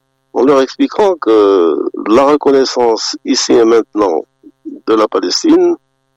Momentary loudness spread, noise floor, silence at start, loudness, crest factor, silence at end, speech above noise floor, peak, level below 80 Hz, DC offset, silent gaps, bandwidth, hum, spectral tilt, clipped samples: 8 LU; -31 dBFS; 0.35 s; -11 LUFS; 10 dB; 0.4 s; 21 dB; -2 dBFS; -54 dBFS; under 0.1%; none; 8.8 kHz; none; -3.5 dB/octave; under 0.1%